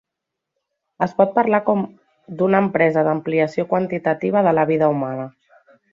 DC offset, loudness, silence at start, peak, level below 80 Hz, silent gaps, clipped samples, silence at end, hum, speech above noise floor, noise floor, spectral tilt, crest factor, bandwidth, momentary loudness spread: under 0.1%; -19 LUFS; 1 s; -2 dBFS; -62 dBFS; none; under 0.1%; 0.65 s; none; 64 dB; -82 dBFS; -9 dB/octave; 18 dB; 7.4 kHz; 10 LU